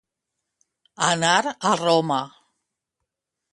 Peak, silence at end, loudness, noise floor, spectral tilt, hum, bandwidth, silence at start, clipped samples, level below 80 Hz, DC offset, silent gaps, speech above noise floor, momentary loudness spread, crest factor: -4 dBFS; 1.25 s; -21 LUFS; -82 dBFS; -3 dB/octave; none; 11.5 kHz; 1 s; under 0.1%; -68 dBFS; under 0.1%; none; 62 dB; 8 LU; 22 dB